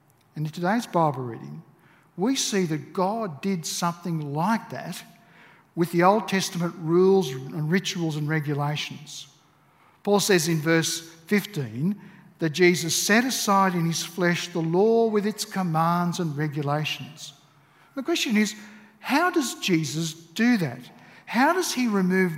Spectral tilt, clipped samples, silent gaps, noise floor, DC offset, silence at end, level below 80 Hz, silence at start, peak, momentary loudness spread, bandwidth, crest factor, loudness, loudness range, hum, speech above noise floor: -4.5 dB/octave; under 0.1%; none; -59 dBFS; under 0.1%; 0 s; -74 dBFS; 0.35 s; -6 dBFS; 15 LU; 16 kHz; 20 dB; -24 LUFS; 5 LU; none; 35 dB